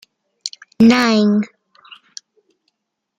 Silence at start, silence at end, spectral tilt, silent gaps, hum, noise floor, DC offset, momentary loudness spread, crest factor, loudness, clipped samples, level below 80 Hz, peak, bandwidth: 0.45 s; 1.75 s; -5 dB/octave; none; none; -71 dBFS; under 0.1%; 25 LU; 18 dB; -14 LUFS; under 0.1%; -58 dBFS; -2 dBFS; 9.2 kHz